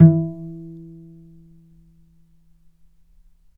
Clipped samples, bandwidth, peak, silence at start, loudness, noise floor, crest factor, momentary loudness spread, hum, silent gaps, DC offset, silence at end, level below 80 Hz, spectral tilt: under 0.1%; 1.8 kHz; 0 dBFS; 0 s; -21 LUFS; -55 dBFS; 22 dB; 26 LU; none; none; under 0.1%; 3 s; -56 dBFS; -14 dB/octave